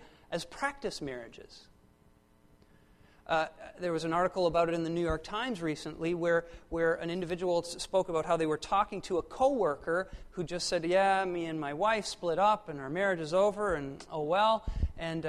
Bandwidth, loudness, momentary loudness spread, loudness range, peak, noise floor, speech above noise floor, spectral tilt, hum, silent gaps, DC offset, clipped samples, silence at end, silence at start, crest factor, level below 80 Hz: 13 kHz; -32 LUFS; 10 LU; 7 LU; -14 dBFS; -64 dBFS; 32 dB; -5 dB/octave; none; none; under 0.1%; under 0.1%; 0 s; 0 s; 18 dB; -50 dBFS